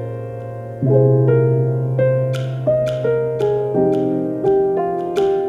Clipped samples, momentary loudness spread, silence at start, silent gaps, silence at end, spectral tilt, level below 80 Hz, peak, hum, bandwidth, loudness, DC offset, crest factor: under 0.1%; 9 LU; 0 s; none; 0 s; -9.5 dB/octave; -50 dBFS; -2 dBFS; none; 7.2 kHz; -17 LUFS; under 0.1%; 14 dB